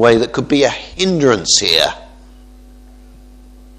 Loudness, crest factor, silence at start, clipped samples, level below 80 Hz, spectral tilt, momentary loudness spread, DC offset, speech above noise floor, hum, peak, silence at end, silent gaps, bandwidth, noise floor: -13 LUFS; 16 dB; 0 s; under 0.1%; -40 dBFS; -3 dB/octave; 7 LU; under 0.1%; 26 dB; none; 0 dBFS; 1.75 s; none; 13.5 kHz; -40 dBFS